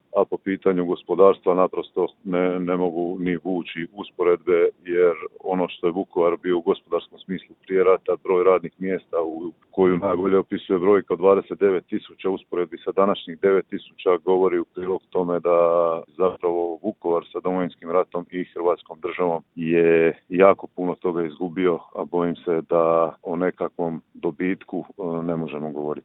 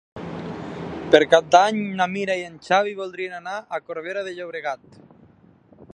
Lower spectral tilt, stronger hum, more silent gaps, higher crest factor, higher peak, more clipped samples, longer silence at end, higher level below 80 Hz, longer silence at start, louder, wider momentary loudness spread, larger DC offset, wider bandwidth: first, -11 dB/octave vs -4.5 dB/octave; neither; neither; about the same, 22 dB vs 22 dB; about the same, 0 dBFS vs 0 dBFS; neither; about the same, 0.05 s vs 0.1 s; second, -64 dBFS vs -58 dBFS; about the same, 0.15 s vs 0.15 s; about the same, -22 LUFS vs -22 LUFS; second, 10 LU vs 17 LU; neither; second, 4 kHz vs 10.5 kHz